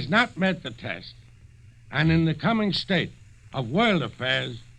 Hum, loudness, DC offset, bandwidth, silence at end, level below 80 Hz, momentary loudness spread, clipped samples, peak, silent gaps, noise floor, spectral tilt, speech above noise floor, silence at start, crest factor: none; -25 LUFS; under 0.1%; 9 kHz; 0.05 s; -50 dBFS; 13 LU; under 0.1%; -8 dBFS; none; -50 dBFS; -6.5 dB/octave; 26 dB; 0 s; 18 dB